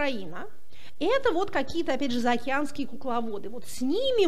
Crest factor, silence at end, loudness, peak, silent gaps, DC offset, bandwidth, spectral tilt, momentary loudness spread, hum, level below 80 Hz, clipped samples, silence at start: 16 dB; 0 s; -29 LUFS; -10 dBFS; none; 4%; 15.5 kHz; -4 dB/octave; 13 LU; none; -56 dBFS; under 0.1%; 0 s